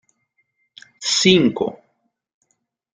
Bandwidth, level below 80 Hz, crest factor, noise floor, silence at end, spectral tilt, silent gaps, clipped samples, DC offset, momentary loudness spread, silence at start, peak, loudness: 9.6 kHz; -56 dBFS; 22 dB; -71 dBFS; 1.2 s; -3.5 dB/octave; none; under 0.1%; under 0.1%; 13 LU; 1 s; -2 dBFS; -17 LUFS